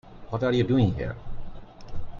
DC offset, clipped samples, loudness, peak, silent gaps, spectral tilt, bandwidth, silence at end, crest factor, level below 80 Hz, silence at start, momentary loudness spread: under 0.1%; under 0.1%; -26 LUFS; -10 dBFS; none; -8.5 dB/octave; 7.2 kHz; 0 s; 18 dB; -40 dBFS; 0.05 s; 21 LU